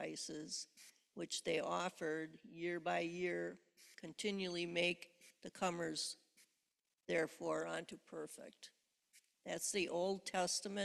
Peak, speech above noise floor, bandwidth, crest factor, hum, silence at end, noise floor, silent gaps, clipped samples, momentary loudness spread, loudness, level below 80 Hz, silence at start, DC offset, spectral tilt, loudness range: -24 dBFS; 46 dB; 14 kHz; 20 dB; none; 0 s; -88 dBFS; none; under 0.1%; 18 LU; -42 LUFS; -82 dBFS; 0 s; under 0.1%; -3 dB/octave; 3 LU